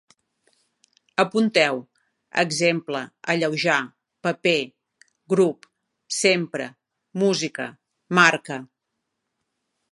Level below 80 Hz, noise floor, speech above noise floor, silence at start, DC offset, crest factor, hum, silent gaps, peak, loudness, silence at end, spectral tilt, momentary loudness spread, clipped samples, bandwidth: -76 dBFS; -80 dBFS; 58 dB; 1.2 s; under 0.1%; 24 dB; none; none; 0 dBFS; -22 LUFS; 1.3 s; -4 dB/octave; 16 LU; under 0.1%; 11.5 kHz